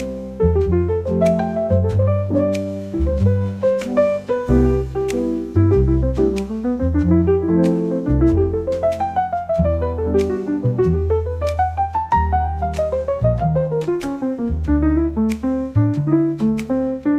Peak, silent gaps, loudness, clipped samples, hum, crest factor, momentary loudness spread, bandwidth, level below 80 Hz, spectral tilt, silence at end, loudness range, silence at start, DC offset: -4 dBFS; none; -19 LUFS; under 0.1%; none; 14 dB; 5 LU; 11 kHz; -28 dBFS; -9 dB/octave; 0 s; 2 LU; 0 s; 0.1%